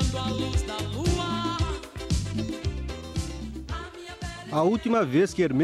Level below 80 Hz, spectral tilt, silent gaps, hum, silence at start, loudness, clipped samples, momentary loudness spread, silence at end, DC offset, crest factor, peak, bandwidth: -36 dBFS; -6 dB/octave; none; none; 0 s; -28 LUFS; under 0.1%; 13 LU; 0 s; under 0.1%; 16 dB; -10 dBFS; 14 kHz